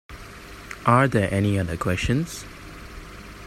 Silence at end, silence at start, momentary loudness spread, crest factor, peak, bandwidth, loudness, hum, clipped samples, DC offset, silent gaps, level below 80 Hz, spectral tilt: 0 s; 0.1 s; 22 LU; 22 dB; -2 dBFS; 14.5 kHz; -22 LUFS; none; under 0.1%; under 0.1%; none; -42 dBFS; -6 dB/octave